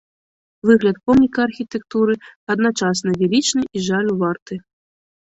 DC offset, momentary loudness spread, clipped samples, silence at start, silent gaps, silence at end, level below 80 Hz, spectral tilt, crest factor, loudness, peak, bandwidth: under 0.1%; 10 LU; under 0.1%; 0.65 s; 2.36-2.47 s, 4.42-4.46 s; 0.8 s; -52 dBFS; -5 dB/octave; 18 dB; -18 LUFS; -2 dBFS; 8.2 kHz